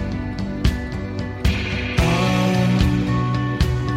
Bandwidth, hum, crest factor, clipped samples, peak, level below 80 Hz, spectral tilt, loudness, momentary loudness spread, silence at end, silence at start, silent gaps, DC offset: 15.5 kHz; none; 14 dB; under 0.1%; -6 dBFS; -28 dBFS; -6.5 dB/octave; -21 LUFS; 9 LU; 0 s; 0 s; none; under 0.1%